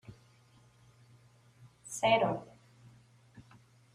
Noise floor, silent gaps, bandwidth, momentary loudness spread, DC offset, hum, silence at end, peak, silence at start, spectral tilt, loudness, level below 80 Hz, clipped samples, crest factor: -63 dBFS; none; 15 kHz; 29 LU; under 0.1%; none; 0.55 s; -14 dBFS; 0.1 s; -4 dB/octave; -31 LUFS; -72 dBFS; under 0.1%; 24 dB